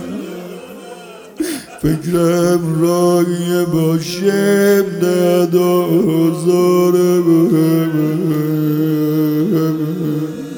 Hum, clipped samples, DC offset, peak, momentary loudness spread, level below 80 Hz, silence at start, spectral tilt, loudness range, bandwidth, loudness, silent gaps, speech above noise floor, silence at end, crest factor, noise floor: none; under 0.1%; under 0.1%; 0 dBFS; 14 LU; -48 dBFS; 0 s; -6.5 dB/octave; 3 LU; 18.5 kHz; -14 LUFS; none; 21 dB; 0 s; 14 dB; -34 dBFS